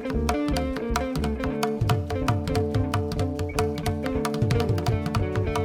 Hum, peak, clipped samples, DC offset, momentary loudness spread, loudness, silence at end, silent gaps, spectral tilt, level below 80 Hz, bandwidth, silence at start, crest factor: none; -8 dBFS; under 0.1%; under 0.1%; 3 LU; -26 LUFS; 0 s; none; -6.5 dB/octave; -34 dBFS; 18 kHz; 0 s; 18 dB